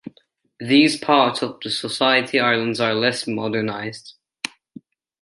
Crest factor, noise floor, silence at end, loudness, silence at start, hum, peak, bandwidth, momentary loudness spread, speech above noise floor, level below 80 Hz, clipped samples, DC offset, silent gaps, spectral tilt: 20 dB; -59 dBFS; 0.75 s; -19 LUFS; 0.05 s; none; -2 dBFS; 11.5 kHz; 15 LU; 40 dB; -68 dBFS; under 0.1%; under 0.1%; none; -4 dB/octave